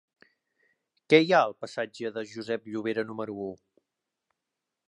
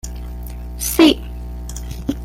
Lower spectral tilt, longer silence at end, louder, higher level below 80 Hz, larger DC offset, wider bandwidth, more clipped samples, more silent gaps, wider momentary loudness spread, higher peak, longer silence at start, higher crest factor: first, -5.5 dB/octave vs -4 dB/octave; first, 1.35 s vs 0 s; second, -28 LUFS vs -16 LUFS; second, -76 dBFS vs -30 dBFS; neither; second, 10.5 kHz vs 17 kHz; neither; neither; second, 15 LU vs 18 LU; second, -6 dBFS vs -2 dBFS; first, 1.1 s vs 0.05 s; first, 24 dB vs 18 dB